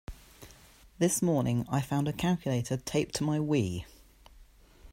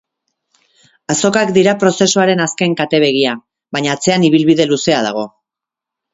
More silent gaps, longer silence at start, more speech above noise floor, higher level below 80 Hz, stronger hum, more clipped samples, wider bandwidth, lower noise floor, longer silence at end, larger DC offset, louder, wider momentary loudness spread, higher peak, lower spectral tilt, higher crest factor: neither; second, 0.1 s vs 1.1 s; second, 27 dB vs 72 dB; about the same, -54 dBFS vs -56 dBFS; neither; neither; first, 16 kHz vs 8 kHz; second, -56 dBFS vs -84 dBFS; second, 0 s vs 0.85 s; neither; second, -30 LUFS vs -13 LUFS; about the same, 12 LU vs 10 LU; second, -14 dBFS vs 0 dBFS; first, -5.5 dB/octave vs -4 dB/octave; about the same, 16 dB vs 14 dB